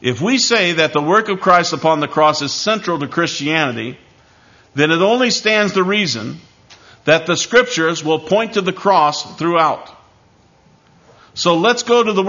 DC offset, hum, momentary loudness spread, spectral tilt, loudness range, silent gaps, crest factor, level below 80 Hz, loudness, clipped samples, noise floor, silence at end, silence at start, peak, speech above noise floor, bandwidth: under 0.1%; none; 7 LU; -3.5 dB/octave; 3 LU; none; 16 dB; -58 dBFS; -15 LUFS; under 0.1%; -51 dBFS; 0 s; 0 s; 0 dBFS; 36 dB; 7.4 kHz